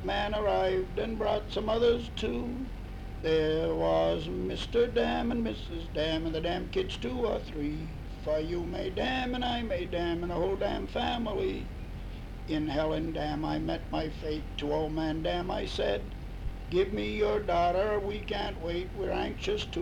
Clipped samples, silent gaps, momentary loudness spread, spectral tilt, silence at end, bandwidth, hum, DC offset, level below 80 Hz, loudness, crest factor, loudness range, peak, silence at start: under 0.1%; none; 10 LU; -6.5 dB/octave; 0 s; 15 kHz; none; under 0.1%; -40 dBFS; -31 LUFS; 14 dB; 3 LU; -16 dBFS; 0 s